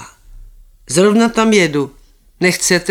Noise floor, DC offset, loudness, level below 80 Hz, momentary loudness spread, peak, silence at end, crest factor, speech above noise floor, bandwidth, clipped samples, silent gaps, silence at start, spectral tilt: -40 dBFS; under 0.1%; -13 LUFS; -44 dBFS; 8 LU; 0 dBFS; 0 s; 16 dB; 27 dB; 17.5 kHz; under 0.1%; none; 0 s; -4 dB/octave